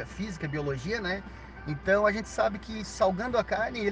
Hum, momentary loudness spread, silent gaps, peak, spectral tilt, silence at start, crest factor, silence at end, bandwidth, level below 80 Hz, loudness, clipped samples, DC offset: none; 12 LU; none; -12 dBFS; -5.5 dB/octave; 0 s; 18 dB; 0 s; 9.6 kHz; -48 dBFS; -29 LUFS; under 0.1%; under 0.1%